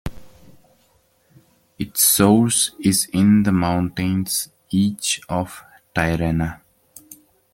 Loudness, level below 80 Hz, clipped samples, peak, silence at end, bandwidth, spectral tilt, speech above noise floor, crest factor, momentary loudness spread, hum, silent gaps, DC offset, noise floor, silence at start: -19 LUFS; -44 dBFS; under 0.1%; -2 dBFS; 0.4 s; 17 kHz; -4 dB/octave; 42 dB; 18 dB; 12 LU; none; none; under 0.1%; -60 dBFS; 0.05 s